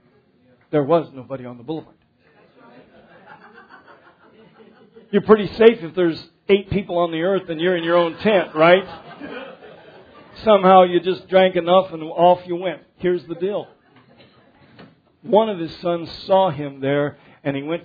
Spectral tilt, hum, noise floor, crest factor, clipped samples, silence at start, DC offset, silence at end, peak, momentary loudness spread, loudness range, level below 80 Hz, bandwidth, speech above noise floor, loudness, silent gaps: -8.5 dB/octave; none; -57 dBFS; 20 dB; under 0.1%; 0.75 s; under 0.1%; 0.05 s; 0 dBFS; 18 LU; 10 LU; -54 dBFS; 5 kHz; 39 dB; -18 LUFS; none